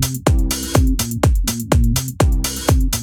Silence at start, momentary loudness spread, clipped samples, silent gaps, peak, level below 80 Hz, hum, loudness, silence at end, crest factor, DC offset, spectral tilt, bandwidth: 0 s; 2 LU; under 0.1%; none; 0 dBFS; -20 dBFS; none; -18 LUFS; 0 s; 16 dB; under 0.1%; -5 dB/octave; 20 kHz